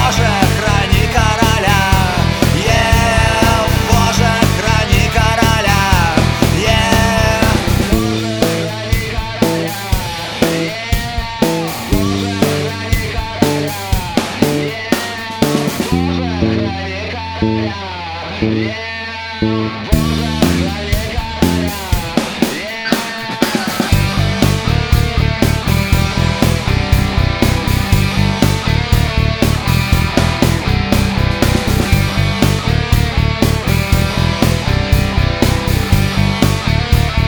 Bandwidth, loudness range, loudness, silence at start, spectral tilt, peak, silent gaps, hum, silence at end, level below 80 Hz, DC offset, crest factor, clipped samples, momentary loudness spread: over 20 kHz; 5 LU; -14 LUFS; 0 s; -5 dB/octave; 0 dBFS; none; none; 0 s; -22 dBFS; under 0.1%; 14 dB; 0.2%; 6 LU